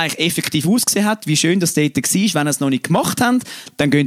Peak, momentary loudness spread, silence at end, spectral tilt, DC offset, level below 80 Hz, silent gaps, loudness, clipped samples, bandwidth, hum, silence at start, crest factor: -2 dBFS; 3 LU; 0 s; -4 dB/octave; under 0.1%; -56 dBFS; none; -16 LUFS; under 0.1%; 16.5 kHz; none; 0 s; 14 dB